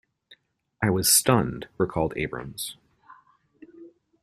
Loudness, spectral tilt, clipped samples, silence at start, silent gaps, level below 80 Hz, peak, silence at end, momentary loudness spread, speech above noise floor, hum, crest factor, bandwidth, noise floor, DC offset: -24 LUFS; -3.5 dB/octave; under 0.1%; 0.3 s; none; -52 dBFS; -6 dBFS; 0.35 s; 16 LU; 36 dB; none; 22 dB; 15.5 kHz; -61 dBFS; under 0.1%